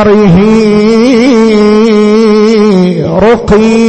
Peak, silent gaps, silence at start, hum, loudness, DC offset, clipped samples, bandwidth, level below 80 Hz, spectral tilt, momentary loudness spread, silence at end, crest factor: 0 dBFS; none; 0 s; none; -5 LUFS; under 0.1%; 1%; 8.6 kHz; -30 dBFS; -7 dB/octave; 2 LU; 0 s; 4 dB